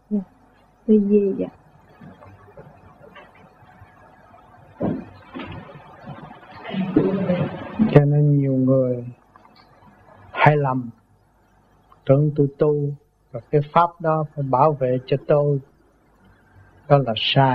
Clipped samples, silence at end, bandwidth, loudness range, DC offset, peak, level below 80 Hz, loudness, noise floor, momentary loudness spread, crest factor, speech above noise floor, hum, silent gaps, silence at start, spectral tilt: under 0.1%; 0 s; 5.2 kHz; 15 LU; under 0.1%; 0 dBFS; -56 dBFS; -20 LUFS; -58 dBFS; 21 LU; 22 dB; 39 dB; none; none; 0.1 s; -9.5 dB/octave